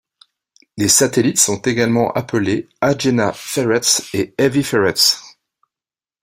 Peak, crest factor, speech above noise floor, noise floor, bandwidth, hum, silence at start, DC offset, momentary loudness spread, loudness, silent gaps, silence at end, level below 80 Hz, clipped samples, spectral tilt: 0 dBFS; 18 dB; over 74 dB; under -90 dBFS; 16.5 kHz; none; 0.75 s; under 0.1%; 7 LU; -16 LUFS; none; 0.95 s; -54 dBFS; under 0.1%; -3 dB/octave